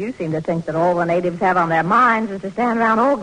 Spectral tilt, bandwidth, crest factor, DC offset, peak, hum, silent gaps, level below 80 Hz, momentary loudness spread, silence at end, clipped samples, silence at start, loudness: -7 dB/octave; 10 kHz; 14 dB; under 0.1%; -4 dBFS; none; none; -54 dBFS; 8 LU; 0 s; under 0.1%; 0 s; -18 LUFS